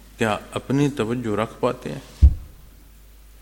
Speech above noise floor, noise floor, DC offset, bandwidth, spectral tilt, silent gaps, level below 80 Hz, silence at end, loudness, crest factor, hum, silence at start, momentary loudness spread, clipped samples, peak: 23 dB; -47 dBFS; under 0.1%; 16.5 kHz; -7 dB/octave; none; -26 dBFS; 0.85 s; -23 LUFS; 20 dB; none; 0.2 s; 12 LU; under 0.1%; -2 dBFS